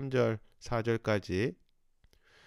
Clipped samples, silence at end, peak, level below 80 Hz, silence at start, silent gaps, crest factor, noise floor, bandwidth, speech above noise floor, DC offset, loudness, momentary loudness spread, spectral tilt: under 0.1%; 0.9 s; -16 dBFS; -56 dBFS; 0 s; none; 18 dB; -67 dBFS; 12 kHz; 36 dB; under 0.1%; -33 LUFS; 6 LU; -7 dB/octave